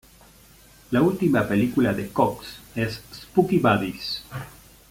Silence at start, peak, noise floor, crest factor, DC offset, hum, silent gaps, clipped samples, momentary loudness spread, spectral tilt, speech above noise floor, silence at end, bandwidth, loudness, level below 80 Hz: 0.9 s; -4 dBFS; -51 dBFS; 20 dB; under 0.1%; none; none; under 0.1%; 17 LU; -6.5 dB/octave; 29 dB; 0.4 s; 17 kHz; -23 LUFS; -52 dBFS